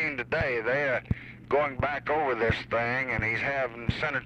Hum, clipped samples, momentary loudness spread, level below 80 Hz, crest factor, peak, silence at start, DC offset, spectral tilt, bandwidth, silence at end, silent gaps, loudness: none; under 0.1%; 4 LU; -46 dBFS; 18 dB; -12 dBFS; 0 s; under 0.1%; -6.5 dB/octave; 9.4 kHz; 0 s; none; -28 LUFS